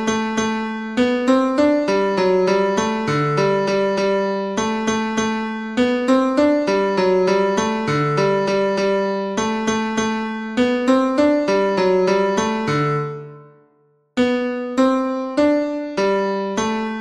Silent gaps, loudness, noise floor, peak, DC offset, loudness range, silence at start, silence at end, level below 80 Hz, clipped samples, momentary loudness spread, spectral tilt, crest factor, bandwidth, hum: none; -19 LUFS; -59 dBFS; -4 dBFS; under 0.1%; 3 LU; 0 s; 0 s; -52 dBFS; under 0.1%; 6 LU; -5.5 dB/octave; 16 dB; 10.5 kHz; none